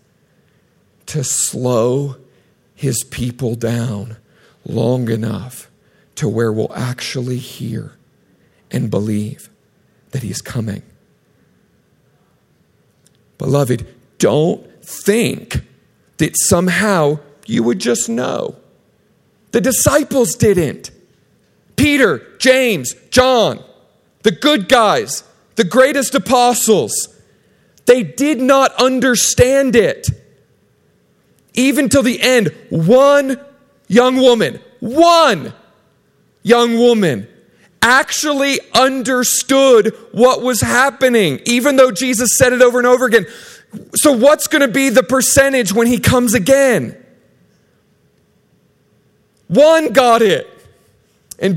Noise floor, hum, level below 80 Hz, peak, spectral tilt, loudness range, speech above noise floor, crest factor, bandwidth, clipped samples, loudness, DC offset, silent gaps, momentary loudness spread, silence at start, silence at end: -56 dBFS; none; -44 dBFS; 0 dBFS; -4 dB/octave; 11 LU; 43 dB; 14 dB; 16.5 kHz; under 0.1%; -13 LUFS; under 0.1%; none; 15 LU; 1.05 s; 0 s